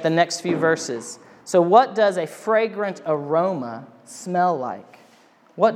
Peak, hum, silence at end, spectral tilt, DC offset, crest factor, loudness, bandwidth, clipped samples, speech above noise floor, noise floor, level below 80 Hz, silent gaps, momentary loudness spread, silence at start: 0 dBFS; none; 0 s; -5 dB/octave; under 0.1%; 20 dB; -21 LUFS; 14.5 kHz; under 0.1%; 33 dB; -54 dBFS; -84 dBFS; none; 21 LU; 0 s